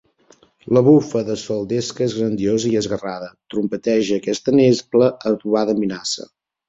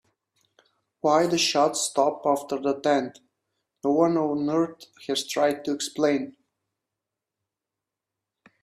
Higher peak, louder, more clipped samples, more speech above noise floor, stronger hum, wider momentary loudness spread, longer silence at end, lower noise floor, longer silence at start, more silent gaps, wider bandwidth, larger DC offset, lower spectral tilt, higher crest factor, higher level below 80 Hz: first, -2 dBFS vs -8 dBFS; first, -19 LUFS vs -24 LUFS; neither; second, 36 dB vs 63 dB; neither; about the same, 10 LU vs 8 LU; second, 0.45 s vs 2.3 s; second, -54 dBFS vs -87 dBFS; second, 0.65 s vs 1.05 s; neither; second, 8.2 kHz vs 15.5 kHz; neither; first, -6 dB/octave vs -3.5 dB/octave; about the same, 16 dB vs 20 dB; first, -56 dBFS vs -72 dBFS